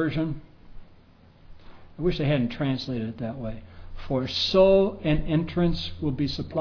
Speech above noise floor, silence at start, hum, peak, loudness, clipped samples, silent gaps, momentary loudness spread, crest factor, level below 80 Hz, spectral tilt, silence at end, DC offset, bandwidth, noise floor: 29 dB; 0 s; none; -8 dBFS; -25 LUFS; under 0.1%; none; 14 LU; 18 dB; -40 dBFS; -7.5 dB/octave; 0 s; under 0.1%; 5.4 kHz; -53 dBFS